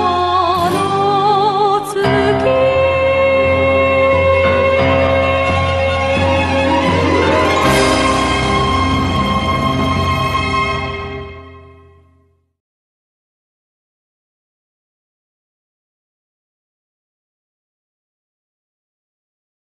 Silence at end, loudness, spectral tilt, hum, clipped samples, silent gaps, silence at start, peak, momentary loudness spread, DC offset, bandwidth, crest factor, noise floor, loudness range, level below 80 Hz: 8.05 s; -13 LUFS; -5.5 dB/octave; none; under 0.1%; none; 0 s; -2 dBFS; 4 LU; under 0.1%; 12.5 kHz; 14 dB; -56 dBFS; 8 LU; -34 dBFS